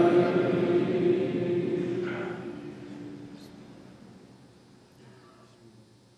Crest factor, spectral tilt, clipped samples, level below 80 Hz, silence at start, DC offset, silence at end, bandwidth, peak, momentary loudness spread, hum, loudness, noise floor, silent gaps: 18 dB; -8 dB/octave; under 0.1%; -72 dBFS; 0 s; under 0.1%; 1.9 s; 7.8 kHz; -12 dBFS; 23 LU; none; -27 LUFS; -56 dBFS; none